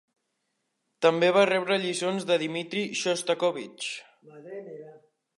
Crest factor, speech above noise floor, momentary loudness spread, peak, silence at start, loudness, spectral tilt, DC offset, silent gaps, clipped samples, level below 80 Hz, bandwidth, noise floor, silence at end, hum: 22 dB; 52 dB; 20 LU; -6 dBFS; 1 s; -26 LUFS; -3.5 dB/octave; under 0.1%; none; under 0.1%; -82 dBFS; 11.5 kHz; -78 dBFS; 0.4 s; none